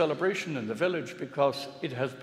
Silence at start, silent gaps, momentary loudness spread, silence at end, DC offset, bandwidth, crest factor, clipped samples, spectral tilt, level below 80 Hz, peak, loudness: 0 s; none; 8 LU; 0 s; under 0.1%; 14.5 kHz; 18 dB; under 0.1%; -5.5 dB/octave; -78 dBFS; -12 dBFS; -31 LUFS